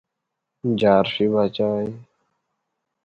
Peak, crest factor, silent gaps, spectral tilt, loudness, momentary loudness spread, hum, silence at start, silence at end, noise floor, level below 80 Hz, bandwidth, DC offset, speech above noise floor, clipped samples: -4 dBFS; 20 dB; none; -8 dB/octave; -20 LUFS; 11 LU; none; 0.65 s; 1 s; -81 dBFS; -58 dBFS; 7 kHz; under 0.1%; 61 dB; under 0.1%